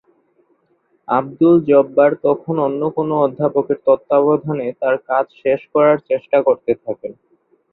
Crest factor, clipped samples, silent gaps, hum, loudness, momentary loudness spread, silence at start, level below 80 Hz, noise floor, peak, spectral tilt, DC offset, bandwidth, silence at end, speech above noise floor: 16 dB; under 0.1%; none; none; -16 LUFS; 7 LU; 1.1 s; -62 dBFS; -62 dBFS; -2 dBFS; -11.5 dB/octave; under 0.1%; 4.1 kHz; 0.6 s; 46 dB